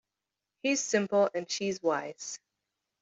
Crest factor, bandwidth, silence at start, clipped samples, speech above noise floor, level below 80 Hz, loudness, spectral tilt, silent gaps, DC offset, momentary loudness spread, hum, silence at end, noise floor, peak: 18 dB; 8.2 kHz; 0.65 s; under 0.1%; 58 dB; -80 dBFS; -30 LUFS; -3 dB/octave; none; under 0.1%; 13 LU; none; 0.65 s; -88 dBFS; -14 dBFS